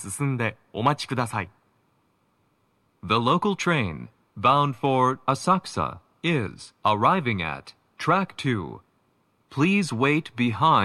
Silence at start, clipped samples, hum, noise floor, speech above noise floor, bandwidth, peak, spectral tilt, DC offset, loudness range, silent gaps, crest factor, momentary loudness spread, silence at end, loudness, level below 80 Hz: 0 s; under 0.1%; none; -68 dBFS; 44 dB; 14 kHz; -6 dBFS; -5.5 dB/octave; under 0.1%; 4 LU; none; 20 dB; 11 LU; 0 s; -24 LUFS; -58 dBFS